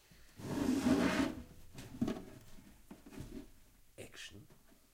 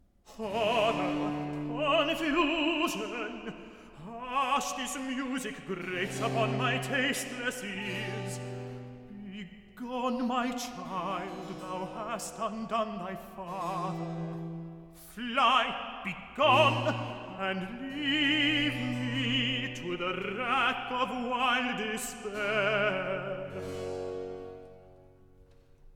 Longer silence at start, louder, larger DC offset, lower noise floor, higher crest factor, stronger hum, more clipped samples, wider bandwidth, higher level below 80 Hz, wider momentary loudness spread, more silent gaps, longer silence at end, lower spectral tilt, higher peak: second, 0.1 s vs 0.25 s; second, -37 LUFS vs -31 LUFS; neither; first, -63 dBFS vs -58 dBFS; about the same, 22 dB vs 22 dB; neither; neither; second, 16 kHz vs 18 kHz; about the same, -58 dBFS vs -58 dBFS; first, 26 LU vs 15 LU; neither; first, 0.4 s vs 0 s; first, -5.5 dB/octave vs -4 dB/octave; second, -20 dBFS vs -10 dBFS